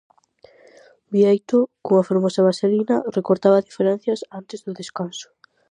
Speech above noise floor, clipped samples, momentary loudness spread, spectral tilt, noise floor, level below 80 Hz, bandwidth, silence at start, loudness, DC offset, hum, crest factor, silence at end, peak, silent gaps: 33 dB; under 0.1%; 15 LU; -7 dB/octave; -53 dBFS; -72 dBFS; 10 kHz; 1.1 s; -20 LUFS; under 0.1%; none; 18 dB; 0.5 s; -4 dBFS; none